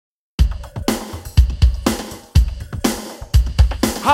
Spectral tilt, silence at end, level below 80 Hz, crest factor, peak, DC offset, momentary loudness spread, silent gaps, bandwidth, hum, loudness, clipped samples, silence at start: -5.5 dB/octave; 0 s; -20 dBFS; 16 dB; 0 dBFS; under 0.1%; 8 LU; none; 16.5 kHz; none; -19 LUFS; under 0.1%; 0.4 s